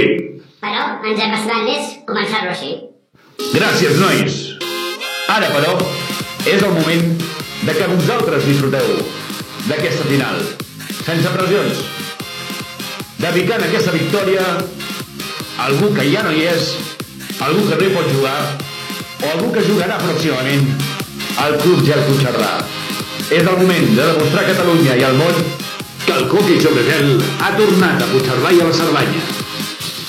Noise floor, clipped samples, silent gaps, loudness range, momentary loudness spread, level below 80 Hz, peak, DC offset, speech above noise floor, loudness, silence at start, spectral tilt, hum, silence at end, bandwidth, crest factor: -48 dBFS; under 0.1%; none; 5 LU; 12 LU; -54 dBFS; 0 dBFS; under 0.1%; 34 dB; -15 LUFS; 0 s; -5 dB/octave; none; 0 s; 16.5 kHz; 16 dB